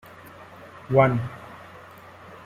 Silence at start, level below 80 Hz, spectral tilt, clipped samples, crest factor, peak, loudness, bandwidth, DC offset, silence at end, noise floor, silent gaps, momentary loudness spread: 0.4 s; -54 dBFS; -8.5 dB/octave; under 0.1%; 22 dB; -4 dBFS; -22 LUFS; 14.5 kHz; under 0.1%; 0.1 s; -46 dBFS; none; 25 LU